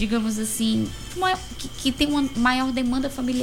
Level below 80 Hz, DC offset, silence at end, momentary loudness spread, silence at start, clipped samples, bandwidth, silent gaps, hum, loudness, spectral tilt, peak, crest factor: -40 dBFS; under 0.1%; 0 s; 6 LU; 0 s; under 0.1%; 17 kHz; none; none; -24 LUFS; -3.5 dB/octave; -8 dBFS; 16 dB